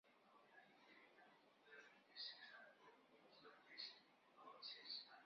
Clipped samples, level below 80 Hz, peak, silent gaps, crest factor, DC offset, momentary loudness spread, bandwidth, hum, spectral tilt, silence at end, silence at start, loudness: under 0.1%; under -90 dBFS; -40 dBFS; none; 22 dB; under 0.1%; 15 LU; 6.4 kHz; none; 2 dB/octave; 0 s; 0.05 s; -58 LUFS